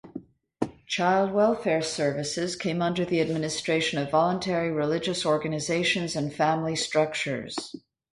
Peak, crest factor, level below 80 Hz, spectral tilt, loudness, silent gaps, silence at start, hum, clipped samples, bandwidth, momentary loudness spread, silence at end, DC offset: -10 dBFS; 18 dB; -62 dBFS; -4.5 dB/octave; -26 LUFS; none; 0.05 s; none; under 0.1%; 11.5 kHz; 11 LU; 0.35 s; under 0.1%